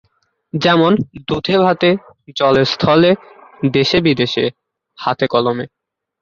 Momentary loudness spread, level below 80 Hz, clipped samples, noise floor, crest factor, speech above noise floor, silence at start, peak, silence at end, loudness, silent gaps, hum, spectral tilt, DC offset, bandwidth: 10 LU; -48 dBFS; under 0.1%; -45 dBFS; 14 dB; 30 dB; 0.55 s; -2 dBFS; 0.55 s; -15 LUFS; none; none; -6.5 dB/octave; under 0.1%; 7.4 kHz